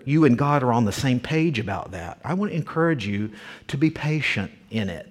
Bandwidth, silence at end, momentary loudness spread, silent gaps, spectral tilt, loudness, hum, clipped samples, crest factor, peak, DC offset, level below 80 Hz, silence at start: 15 kHz; 0 s; 12 LU; none; -6.5 dB/octave; -23 LUFS; none; under 0.1%; 18 dB; -6 dBFS; under 0.1%; -52 dBFS; 0 s